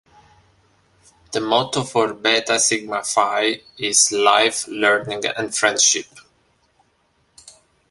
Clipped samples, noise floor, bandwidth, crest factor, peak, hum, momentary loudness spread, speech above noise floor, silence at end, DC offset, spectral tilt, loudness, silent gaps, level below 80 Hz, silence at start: under 0.1%; -63 dBFS; 12 kHz; 20 dB; 0 dBFS; none; 8 LU; 44 dB; 0.4 s; under 0.1%; -1 dB/octave; -18 LUFS; none; -62 dBFS; 1.3 s